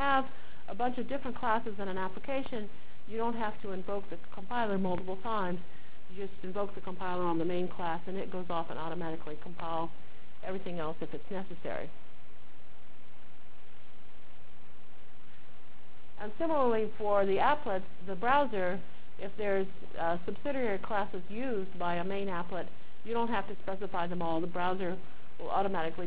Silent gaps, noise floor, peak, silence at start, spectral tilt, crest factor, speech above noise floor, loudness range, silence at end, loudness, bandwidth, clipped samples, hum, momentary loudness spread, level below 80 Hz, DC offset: none; -59 dBFS; -14 dBFS; 0 s; -9 dB/octave; 22 dB; 24 dB; 11 LU; 0 s; -35 LUFS; 4 kHz; under 0.1%; none; 15 LU; -60 dBFS; 4%